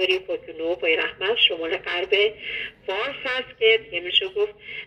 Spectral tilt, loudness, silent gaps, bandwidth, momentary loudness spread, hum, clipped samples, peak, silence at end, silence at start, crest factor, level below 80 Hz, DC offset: -3.5 dB/octave; -22 LUFS; none; 8.8 kHz; 10 LU; none; under 0.1%; -4 dBFS; 0 s; 0 s; 20 dB; -60 dBFS; under 0.1%